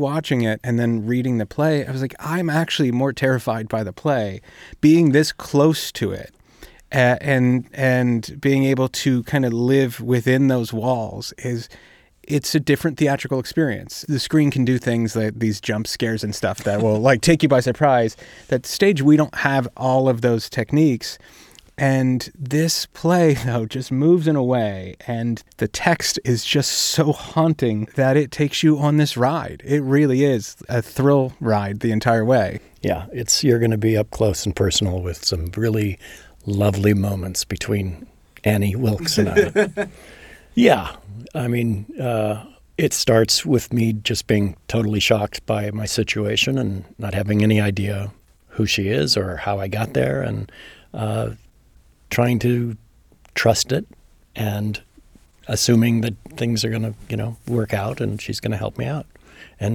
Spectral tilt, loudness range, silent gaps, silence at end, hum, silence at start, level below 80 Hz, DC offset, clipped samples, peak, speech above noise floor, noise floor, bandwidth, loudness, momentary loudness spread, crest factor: -5.5 dB/octave; 4 LU; none; 0 s; none; 0 s; -46 dBFS; under 0.1%; under 0.1%; -2 dBFS; 33 dB; -53 dBFS; 18.5 kHz; -20 LUFS; 10 LU; 18 dB